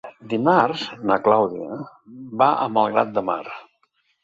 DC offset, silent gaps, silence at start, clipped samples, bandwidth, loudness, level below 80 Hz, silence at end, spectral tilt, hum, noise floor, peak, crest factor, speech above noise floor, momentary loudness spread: under 0.1%; none; 0.05 s; under 0.1%; 7.8 kHz; -20 LUFS; -64 dBFS; 0.6 s; -7 dB/octave; none; -67 dBFS; -2 dBFS; 20 dB; 46 dB; 18 LU